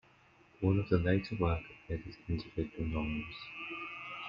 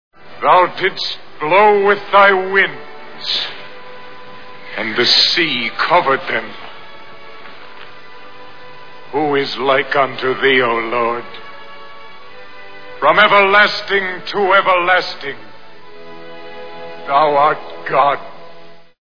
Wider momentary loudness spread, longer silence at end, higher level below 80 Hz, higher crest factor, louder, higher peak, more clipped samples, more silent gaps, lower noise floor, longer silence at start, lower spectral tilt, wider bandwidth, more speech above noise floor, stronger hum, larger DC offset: second, 12 LU vs 25 LU; about the same, 0 s vs 0 s; first, -50 dBFS vs -62 dBFS; first, 22 dB vs 16 dB; second, -36 LUFS vs -14 LUFS; second, -14 dBFS vs 0 dBFS; neither; neither; first, -64 dBFS vs -40 dBFS; first, 0.6 s vs 0.1 s; first, -9 dB/octave vs -4 dB/octave; about the same, 5.6 kHz vs 5.4 kHz; first, 30 dB vs 26 dB; neither; second, under 0.1% vs 3%